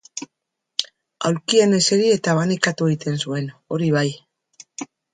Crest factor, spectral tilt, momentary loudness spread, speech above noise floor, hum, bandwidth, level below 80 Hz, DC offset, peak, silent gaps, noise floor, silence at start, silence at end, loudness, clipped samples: 22 dB; -4.5 dB/octave; 19 LU; 61 dB; none; 9.6 kHz; -64 dBFS; under 0.1%; 0 dBFS; none; -79 dBFS; 0.15 s; 0.3 s; -20 LUFS; under 0.1%